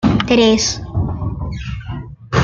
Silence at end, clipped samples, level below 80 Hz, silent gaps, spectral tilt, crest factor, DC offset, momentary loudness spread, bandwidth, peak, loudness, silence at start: 0 s; under 0.1%; -32 dBFS; none; -5 dB/octave; 16 dB; under 0.1%; 15 LU; 7.6 kHz; -2 dBFS; -17 LUFS; 0 s